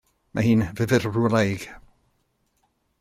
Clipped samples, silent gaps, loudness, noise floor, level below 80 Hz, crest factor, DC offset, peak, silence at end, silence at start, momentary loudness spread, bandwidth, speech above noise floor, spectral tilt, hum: under 0.1%; none; -23 LUFS; -70 dBFS; -54 dBFS; 18 dB; under 0.1%; -6 dBFS; 1.25 s; 0.35 s; 12 LU; 15 kHz; 48 dB; -6.5 dB/octave; none